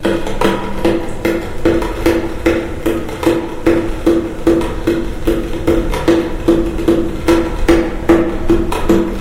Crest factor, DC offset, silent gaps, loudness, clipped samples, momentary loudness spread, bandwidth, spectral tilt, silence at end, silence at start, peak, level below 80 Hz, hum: 14 dB; 0.8%; none; -15 LUFS; under 0.1%; 4 LU; 16 kHz; -6.5 dB/octave; 0 s; 0 s; 0 dBFS; -22 dBFS; none